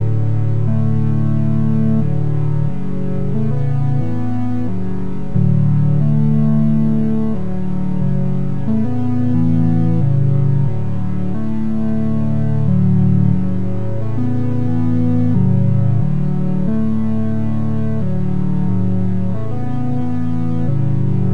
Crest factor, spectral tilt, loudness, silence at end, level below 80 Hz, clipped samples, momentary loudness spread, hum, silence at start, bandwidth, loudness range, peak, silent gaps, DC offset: 12 dB; -11 dB/octave; -18 LUFS; 0 s; -36 dBFS; under 0.1%; 7 LU; none; 0 s; 4.2 kHz; 3 LU; -2 dBFS; none; 10%